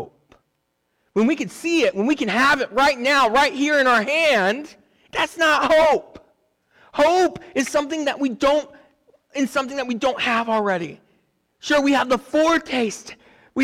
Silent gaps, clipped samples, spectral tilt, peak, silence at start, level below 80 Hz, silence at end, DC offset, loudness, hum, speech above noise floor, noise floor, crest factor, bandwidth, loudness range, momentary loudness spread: none; under 0.1%; -3.5 dB/octave; -10 dBFS; 0 s; -54 dBFS; 0 s; under 0.1%; -19 LUFS; none; 52 dB; -72 dBFS; 12 dB; 17.5 kHz; 5 LU; 10 LU